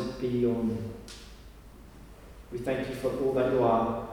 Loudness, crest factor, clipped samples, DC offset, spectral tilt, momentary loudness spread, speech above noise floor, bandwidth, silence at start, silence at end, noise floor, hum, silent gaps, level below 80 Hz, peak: -29 LUFS; 18 dB; under 0.1%; under 0.1%; -7 dB/octave; 21 LU; 21 dB; 20 kHz; 0 s; 0 s; -49 dBFS; none; none; -50 dBFS; -12 dBFS